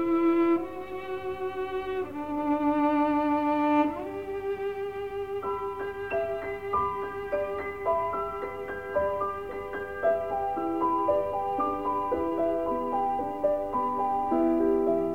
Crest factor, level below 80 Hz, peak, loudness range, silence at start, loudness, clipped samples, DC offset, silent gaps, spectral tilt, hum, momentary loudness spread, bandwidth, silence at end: 16 dB; -54 dBFS; -12 dBFS; 4 LU; 0 s; -29 LUFS; under 0.1%; 0.2%; none; -7.5 dB/octave; none; 10 LU; 16 kHz; 0 s